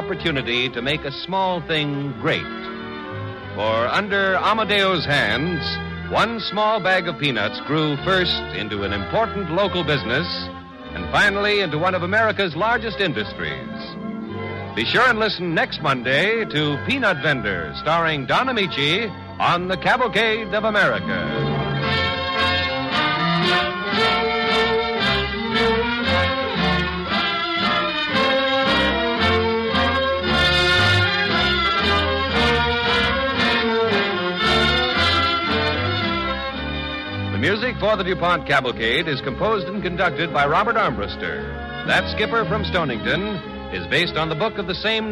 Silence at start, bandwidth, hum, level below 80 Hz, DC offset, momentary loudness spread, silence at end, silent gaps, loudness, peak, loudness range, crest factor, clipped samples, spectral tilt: 0 s; 12.5 kHz; none; -40 dBFS; under 0.1%; 9 LU; 0 s; none; -20 LUFS; -6 dBFS; 4 LU; 14 dB; under 0.1%; -5 dB/octave